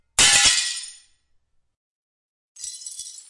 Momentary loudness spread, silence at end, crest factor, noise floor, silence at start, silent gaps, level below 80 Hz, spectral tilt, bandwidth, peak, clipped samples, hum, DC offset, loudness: 22 LU; 0.1 s; 20 dB; -65 dBFS; 0.2 s; 1.77-2.55 s; -50 dBFS; 1.5 dB/octave; 11.5 kHz; -4 dBFS; under 0.1%; none; under 0.1%; -15 LUFS